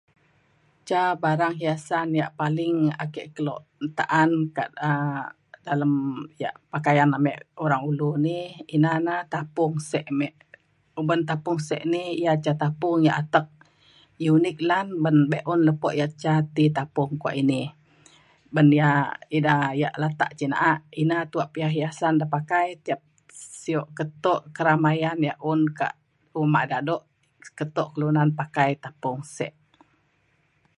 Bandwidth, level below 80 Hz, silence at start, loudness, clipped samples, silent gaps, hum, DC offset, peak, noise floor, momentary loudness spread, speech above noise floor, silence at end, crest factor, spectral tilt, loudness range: 11.5 kHz; -70 dBFS; 0.85 s; -24 LUFS; under 0.1%; none; none; under 0.1%; -2 dBFS; -67 dBFS; 11 LU; 43 dB; 1.25 s; 22 dB; -7 dB/octave; 4 LU